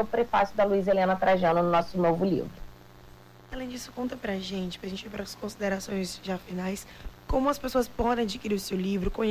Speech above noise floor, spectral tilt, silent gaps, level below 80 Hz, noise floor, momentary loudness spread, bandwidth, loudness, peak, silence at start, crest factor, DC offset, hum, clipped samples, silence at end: 23 dB; -5.5 dB/octave; none; -46 dBFS; -51 dBFS; 14 LU; 16 kHz; -28 LUFS; -16 dBFS; 0 s; 12 dB; under 0.1%; 60 Hz at -55 dBFS; under 0.1%; 0 s